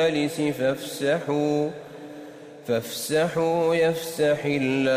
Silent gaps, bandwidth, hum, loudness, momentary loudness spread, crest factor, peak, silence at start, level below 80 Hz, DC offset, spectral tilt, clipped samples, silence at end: none; 16 kHz; none; -24 LUFS; 18 LU; 12 dB; -12 dBFS; 0 s; -64 dBFS; under 0.1%; -5 dB/octave; under 0.1%; 0 s